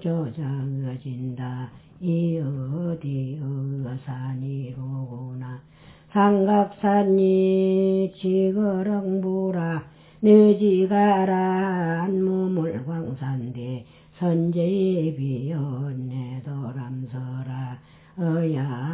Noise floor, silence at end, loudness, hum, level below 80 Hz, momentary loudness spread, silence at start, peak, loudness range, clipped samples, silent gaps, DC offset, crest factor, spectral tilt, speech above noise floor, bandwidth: -50 dBFS; 0 s; -24 LUFS; none; -60 dBFS; 14 LU; 0 s; -4 dBFS; 9 LU; under 0.1%; none; under 0.1%; 18 dB; -12.5 dB/octave; 28 dB; 4 kHz